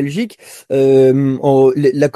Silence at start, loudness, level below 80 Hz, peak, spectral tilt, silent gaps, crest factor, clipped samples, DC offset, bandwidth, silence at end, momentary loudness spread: 0 s; -12 LUFS; -58 dBFS; 0 dBFS; -7.5 dB/octave; none; 12 dB; under 0.1%; under 0.1%; 12.5 kHz; 0.05 s; 11 LU